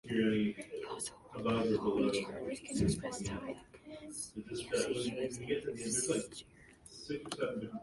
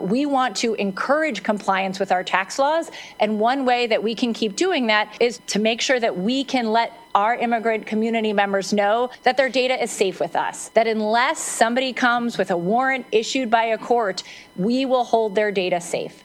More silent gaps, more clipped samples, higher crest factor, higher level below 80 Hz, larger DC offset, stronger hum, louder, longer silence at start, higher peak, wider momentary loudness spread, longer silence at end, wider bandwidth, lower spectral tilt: neither; neither; about the same, 18 dB vs 20 dB; first, -58 dBFS vs -66 dBFS; neither; neither; second, -37 LUFS vs -21 LUFS; about the same, 0.05 s vs 0 s; second, -20 dBFS vs 0 dBFS; first, 14 LU vs 4 LU; about the same, 0 s vs 0.1 s; second, 11.5 kHz vs 15.5 kHz; about the same, -4.5 dB/octave vs -3.5 dB/octave